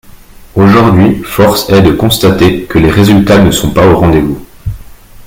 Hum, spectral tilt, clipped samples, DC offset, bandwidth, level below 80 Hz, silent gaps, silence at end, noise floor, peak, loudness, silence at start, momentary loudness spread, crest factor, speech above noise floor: none; -6 dB/octave; 2%; under 0.1%; 17 kHz; -26 dBFS; none; 0 s; -33 dBFS; 0 dBFS; -7 LUFS; 0.55 s; 12 LU; 8 dB; 26 dB